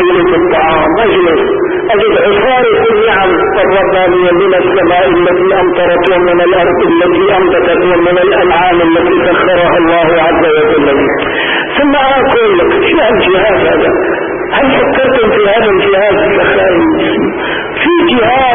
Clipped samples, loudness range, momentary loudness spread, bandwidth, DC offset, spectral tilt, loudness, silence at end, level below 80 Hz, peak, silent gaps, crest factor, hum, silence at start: under 0.1%; 1 LU; 3 LU; 3.7 kHz; under 0.1%; -9 dB/octave; -8 LUFS; 0 s; -34 dBFS; 0 dBFS; none; 8 dB; none; 0 s